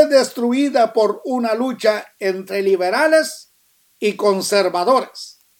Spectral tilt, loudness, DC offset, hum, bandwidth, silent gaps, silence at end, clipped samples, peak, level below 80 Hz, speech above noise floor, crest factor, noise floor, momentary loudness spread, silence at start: -3.5 dB/octave; -18 LUFS; under 0.1%; none; 18.5 kHz; none; 0.3 s; under 0.1%; 0 dBFS; -76 dBFS; 42 dB; 18 dB; -59 dBFS; 8 LU; 0 s